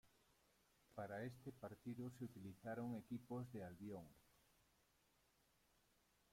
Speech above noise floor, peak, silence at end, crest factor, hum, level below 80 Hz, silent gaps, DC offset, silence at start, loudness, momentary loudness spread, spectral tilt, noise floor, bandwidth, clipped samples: 28 dB; -40 dBFS; 1.95 s; 16 dB; none; -82 dBFS; none; under 0.1%; 0.05 s; -54 LUFS; 6 LU; -7.5 dB/octave; -81 dBFS; 16.5 kHz; under 0.1%